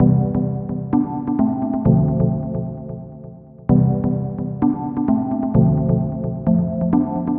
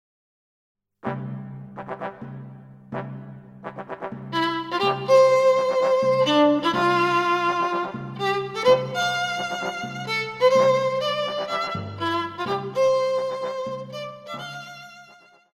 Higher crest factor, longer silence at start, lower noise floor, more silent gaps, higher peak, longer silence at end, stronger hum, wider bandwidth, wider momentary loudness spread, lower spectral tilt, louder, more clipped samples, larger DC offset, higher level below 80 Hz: about the same, 18 dB vs 16 dB; second, 0 s vs 1.05 s; second, -38 dBFS vs -52 dBFS; neither; first, -2 dBFS vs -8 dBFS; second, 0 s vs 0.5 s; neither; second, 2.4 kHz vs 12.5 kHz; second, 13 LU vs 19 LU; first, -14 dB/octave vs -5 dB/octave; first, -19 LUFS vs -22 LUFS; neither; neither; first, -38 dBFS vs -64 dBFS